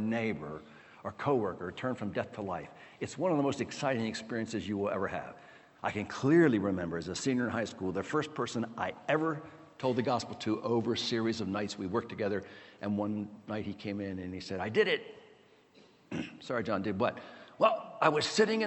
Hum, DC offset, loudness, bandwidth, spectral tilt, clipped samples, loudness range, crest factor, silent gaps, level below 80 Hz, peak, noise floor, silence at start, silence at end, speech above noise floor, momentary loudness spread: none; under 0.1%; -33 LUFS; 8.4 kHz; -5.5 dB/octave; under 0.1%; 5 LU; 24 dB; none; -68 dBFS; -8 dBFS; -61 dBFS; 0 s; 0 s; 29 dB; 13 LU